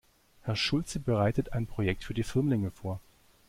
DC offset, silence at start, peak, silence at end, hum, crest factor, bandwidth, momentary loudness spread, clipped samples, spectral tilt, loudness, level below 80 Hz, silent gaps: under 0.1%; 0.45 s; -14 dBFS; 0.45 s; none; 16 dB; 15.5 kHz; 11 LU; under 0.1%; -6 dB/octave; -31 LUFS; -48 dBFS; none